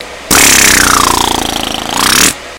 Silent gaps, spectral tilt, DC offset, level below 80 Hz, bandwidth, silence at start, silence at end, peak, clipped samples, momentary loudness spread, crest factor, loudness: none; -1 dB/octave; under 0.1%; -28 dBFS; over 20 kHz; 0 s; 0 s; 0 dBFS; 2%; 11 LU; 10 dB; -6 LUFS